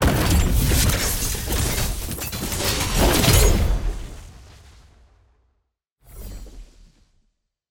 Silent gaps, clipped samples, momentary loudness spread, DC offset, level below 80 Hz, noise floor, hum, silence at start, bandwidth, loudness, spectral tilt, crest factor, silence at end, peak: 5.91-5.96 s; under 0.1%; 23 LU; under 0.1%; -26 dBFS; -72 dBFS; none; 0 s; 17 kHz; -20 LUFS; -4 dB/octave; 18 dB; 1.05 s; -4 dBFS